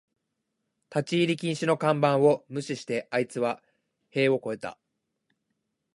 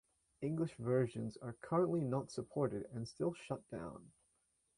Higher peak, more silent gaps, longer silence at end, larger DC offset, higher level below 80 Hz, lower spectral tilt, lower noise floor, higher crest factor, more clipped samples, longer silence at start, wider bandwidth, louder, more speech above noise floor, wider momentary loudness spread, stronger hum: first, -8 dBFS vs -24 dBFS; neither; first, 1.2 s vs 0.7 s; neither; about the same, -76 dBFS vs -72 dBFS; second, -6 dB/octave vs -7.5 dB/octave; about the same, -81 dBFS vs -80 dBFS; about the same, 20 dB vs 16 dB; neither; first, 0.9 s vs 0.4 s; about the same, 11.5 kHz vs 11 kHz; first, -27 LUFS vs -40 LUFS; first, 55 dB vs 41 dB; about the same, 12 LU vs 12 LU; neither